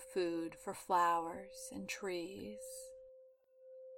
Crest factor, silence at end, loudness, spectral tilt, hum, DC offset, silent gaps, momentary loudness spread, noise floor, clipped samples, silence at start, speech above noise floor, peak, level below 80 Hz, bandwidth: 20 dB; 0 s; -40 LUFS; -3.5 dB/octave; none; under 0.1%; none; 23 LU; -64 dBFS; under 0.1%; 0 s; 24 dB; -22 dBFS; -74 dBFS; 17 kHz